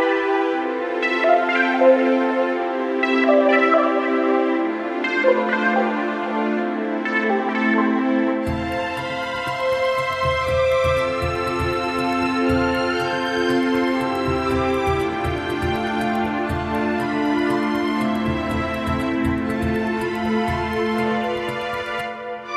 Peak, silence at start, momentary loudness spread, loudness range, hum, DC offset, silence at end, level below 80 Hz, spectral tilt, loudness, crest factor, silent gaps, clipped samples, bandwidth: -4 dBFS; 0 s; 7 LU; 4 LU; none; under 0.1%; 0 s; -42 dBFS; -6 dB/octave; -20 LUFS; 16 dB; none; under 0.1%; 14.5 kHz